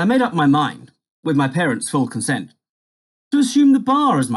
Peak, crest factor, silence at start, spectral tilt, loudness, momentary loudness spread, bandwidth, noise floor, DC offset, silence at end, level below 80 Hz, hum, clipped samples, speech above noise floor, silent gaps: -6 dBFS; 12 dB; 0 s; -5.5 dB/octave; -17 LUFS; 9 LU; 12 kHz; under -90 dBFS; under 0.1%; 0 s; -66 dBFS; none; under 0.1%; over 73 dB; 1.11-1.23 s, 2.69-3.31 s